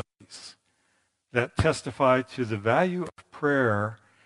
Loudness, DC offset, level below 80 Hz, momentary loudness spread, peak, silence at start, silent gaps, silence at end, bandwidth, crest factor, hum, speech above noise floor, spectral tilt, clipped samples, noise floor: -26 LUFS; under 0.1%; -52 dBFS; 20 LU; -6 dBFS; 0.3 s; none; 0.3 s; 11.5 kHz; 22 dB; none; 46 dB; -6 dB/octave; under 0.1%; -72 dBFS